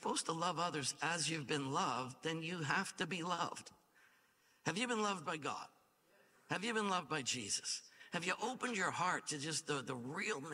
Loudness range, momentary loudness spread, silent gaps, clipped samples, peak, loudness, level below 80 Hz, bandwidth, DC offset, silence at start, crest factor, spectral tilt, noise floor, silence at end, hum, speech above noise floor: 3 LU; 7 LU; none; under 0.1%; -20 dBFS; -40 LUFS; -84 dBFS; 16 kHz; under 0.1%; 0 s; 20 dB; -3 dB/octave; -73 dBFS; 0 s; none; 33 dB